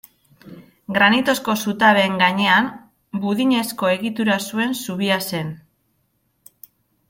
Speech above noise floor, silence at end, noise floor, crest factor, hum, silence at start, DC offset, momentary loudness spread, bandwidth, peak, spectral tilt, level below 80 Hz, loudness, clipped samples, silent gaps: 49 dB; 1.55 s; -67 dBFS; 18 dB; none; 0.45 s; under 0.1%; 12 LU; 16.5 kHz; -2 dBFS; -4.5 dB/octave; -62 dBFS; -18 LUFS; under 0.1%; none